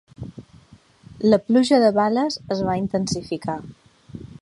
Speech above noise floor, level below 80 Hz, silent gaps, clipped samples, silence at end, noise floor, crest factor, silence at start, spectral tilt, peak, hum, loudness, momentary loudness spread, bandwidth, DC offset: 31 dB; -52 dBFS; none; under 0.1%; 0.15 s; -51 dBFS; 18 dB; 0.2 s; -6 dB/octave; -4 dBFS; none; -20 LUFS; 22 LU; 11.5 kHz; under 0.1%